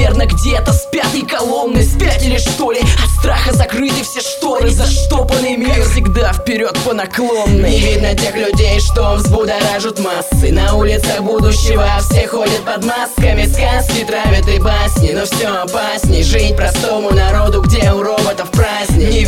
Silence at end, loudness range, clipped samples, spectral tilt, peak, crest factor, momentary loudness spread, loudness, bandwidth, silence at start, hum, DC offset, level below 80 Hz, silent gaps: 0 s; 1 LU; under 0.1%; -5 dB/octave; 0 dBFS; 12 dB; 4 LU; -13 LUFS; 16.5 kHz; 0 s; none; under 0.1%; -14 dBFS; none